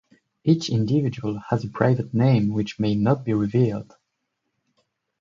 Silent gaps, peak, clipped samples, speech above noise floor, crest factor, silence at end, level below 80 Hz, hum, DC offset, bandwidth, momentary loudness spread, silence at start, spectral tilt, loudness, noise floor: none; -4 dBFS; under 0.1%; 56 dB; 20 dB; 1.4 s; -54 dBFS; none; under 0.1%; 7.4 kHz; 7 LU; 0.45 s; -8 dB/octave; -22 LUFS; -78 dBFS